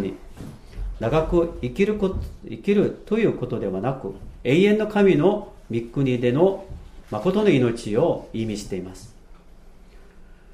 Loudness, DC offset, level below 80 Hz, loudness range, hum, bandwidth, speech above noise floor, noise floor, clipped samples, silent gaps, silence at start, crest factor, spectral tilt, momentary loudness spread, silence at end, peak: -22 LUFS; under 0.1%; -40 dBFS; 4 LU; none; 12.5 kHz; 24 dB; -46 dBFS; under 0.1%; none; 0 s; 18 dB; -7.5 dB/octave; 17 LU; 0 s; -4 dBFS